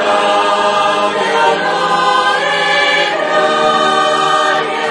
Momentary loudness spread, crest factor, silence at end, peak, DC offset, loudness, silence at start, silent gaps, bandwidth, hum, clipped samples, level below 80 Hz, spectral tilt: 2 LU; 12 dB; 0 s; 0 dBFS; under 0.1%; -12 LUFS; 0 s; none; 10.5 kHz; none; under 0.1%; -60 dBFS; -2.5 dB/octave